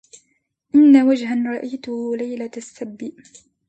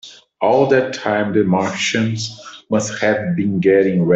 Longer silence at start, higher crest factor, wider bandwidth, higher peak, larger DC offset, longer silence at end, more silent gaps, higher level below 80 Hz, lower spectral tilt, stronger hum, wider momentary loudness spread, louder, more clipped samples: first, 0.75 s vs 0.05 s; about the same, 18 dB vs 14 dB; about the same, 8.6 kHz vs 8.2 kHz; about the same, -2 dBFS vs -2 dBFS; neither; first, 0.6 s vs 0 s; neither; second, -70 dBFS vs -58 dBFS; about the same, -5.5 dB/octave vs -5.5 dB/octave; neither; first, 21 LU vs 7 LU; about the same, -17 LUFS vs -17 LUFS; neither